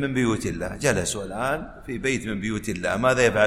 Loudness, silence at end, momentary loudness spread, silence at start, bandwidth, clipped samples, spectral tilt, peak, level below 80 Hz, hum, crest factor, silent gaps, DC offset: -25 LUFS; 0 s; 8 LU; 0 s; 16 kHz; under 0.1%; -4.5 dB/octave; -6 dBFS; -44 dBFS; none; 18 dB; none; under 0.1%